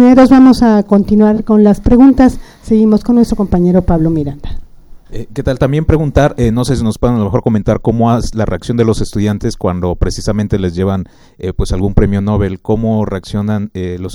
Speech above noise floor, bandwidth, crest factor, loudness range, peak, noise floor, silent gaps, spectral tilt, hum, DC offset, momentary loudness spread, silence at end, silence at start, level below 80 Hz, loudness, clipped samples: 23 dB; 12 kHz; 10 dB; 6 LU; 0 dBFS; -33 dBFS; none; -8 dB/octave; none; under 0.1%; 13 LU; 0 s; 0 s; -24 dBFS; -12 LUFS; 0.4%